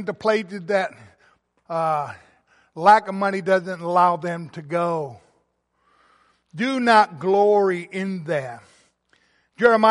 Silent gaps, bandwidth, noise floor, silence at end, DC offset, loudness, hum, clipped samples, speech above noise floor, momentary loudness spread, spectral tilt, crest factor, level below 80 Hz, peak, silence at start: none; 11.5 kHz; -69 dBFS; 0 s; under 0.1%; -21 LUFS; none; under 0.1%; 48 dB; 14 LU; -6 dB/octave; 20 dB; -70 dBFS; -2 dBFS; 0 s